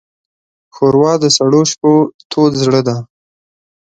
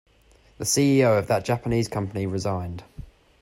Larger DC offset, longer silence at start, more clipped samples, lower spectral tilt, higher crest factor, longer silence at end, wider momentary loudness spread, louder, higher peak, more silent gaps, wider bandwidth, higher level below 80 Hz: neither; first, 0.75 s vs 0.6 s; neither; about the same, -5 dB/octave vs -5 dB/octave; about the same, 14 dB vs 16 dB; first, 0.95 s vs 0.35 s; second, 7 LU vs 12 LU; first, -12 LUFS vs -23 LUFS; first, 0 dBFS vs -8 dBFS; first, 2.14-2.19 s, 2.25-2.30 s vs none; second, 9.4 kHz vs 16 kHz; about the same, -52 dBFS vs -50 dBFS